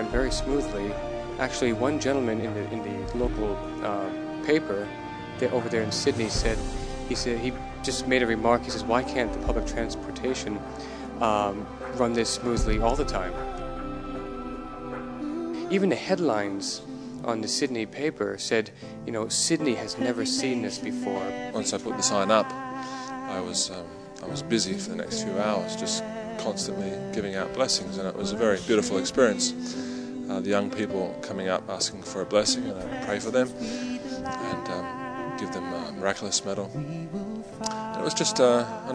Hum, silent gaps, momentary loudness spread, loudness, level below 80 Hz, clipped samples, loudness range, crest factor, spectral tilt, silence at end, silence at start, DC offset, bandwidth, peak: none; none; 11 LU; -28 LUFS; -40 dBFS; under 0.1%; 4 LU; 24 dB; -4 dB/octave; 0 s; 0 s; under 0.1%; 11 kHz; -4 dBFS